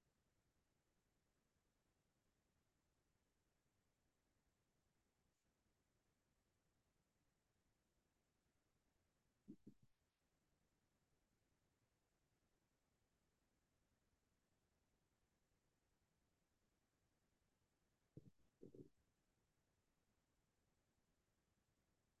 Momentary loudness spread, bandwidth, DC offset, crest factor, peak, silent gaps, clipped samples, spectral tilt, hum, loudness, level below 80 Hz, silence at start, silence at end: 4 LU; 2.5 kHz; under 0.1%; 30 dB; -48 dBFS; none; under 0.1%; -8 dB/octave; none; -68 LUFS; under -90 dBFS; 0 s; 0 s